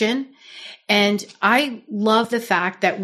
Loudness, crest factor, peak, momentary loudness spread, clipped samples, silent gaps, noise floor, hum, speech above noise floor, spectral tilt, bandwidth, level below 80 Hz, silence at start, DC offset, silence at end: -19 LUFS; 18 dB; -4 dBFS; 19 LU; under 0.1%; none; -41 dBFS; none; 21 dB; -4 dB/octave; 14 kHz; -74 dBFS; 0 s; under 0.1%; 0 s